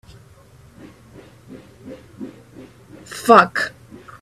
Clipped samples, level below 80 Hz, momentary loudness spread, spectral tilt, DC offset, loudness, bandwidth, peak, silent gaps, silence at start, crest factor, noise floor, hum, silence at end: under 0.1%; -56 dBFS; 28 LU; -4.5 dB/octave; under 0.1%; -15 LUFS; 15.5 kHz; 0 dBFS; none; 1.5 s; 22 dB; -47 dBFS; none; 0.55 s